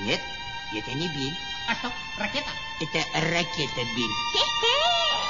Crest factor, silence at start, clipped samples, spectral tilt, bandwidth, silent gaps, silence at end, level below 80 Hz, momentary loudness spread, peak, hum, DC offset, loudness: 18 dB; 0 s; under 0.1%; -3 dB/octave; 7.4 kHz; none; 0 s; -52 dBFS; 11 LU; -8 dBFS; none; 0.6%; -26 LUFS